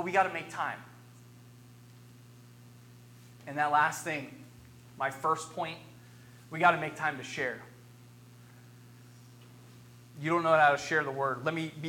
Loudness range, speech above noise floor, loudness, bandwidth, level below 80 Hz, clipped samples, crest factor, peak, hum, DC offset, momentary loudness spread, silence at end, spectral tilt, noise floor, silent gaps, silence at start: 9 LU; 24 dB; -30 LUFS; 17.5 kHz; -72 dBFS; under 0.1%; 24 dB; -10 dBFS; 60 Hz at -55 dBFS; under 0.1%; 22 LU; 0 s; -4.5 dB/octave; -54 dBFS; none; 0 s